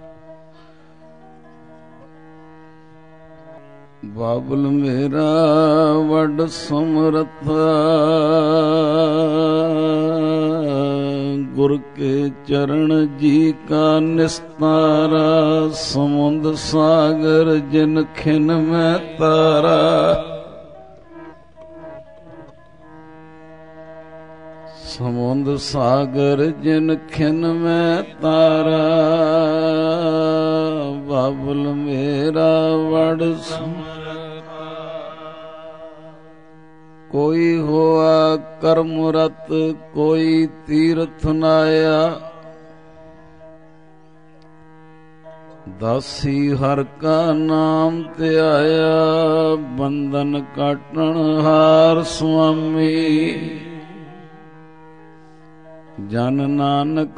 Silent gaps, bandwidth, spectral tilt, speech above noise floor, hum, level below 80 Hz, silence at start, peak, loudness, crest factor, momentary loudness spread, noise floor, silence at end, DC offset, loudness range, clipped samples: none; 10 kHz; -7 dB/octave; 32 dB; none; -48 dBFS; 0.05 s; -2 dBFS; -17 LUFS; 16 dB; 14 LU; -48 dBFS; 0.05 s; 0.4%; 9 LU; under 0.1%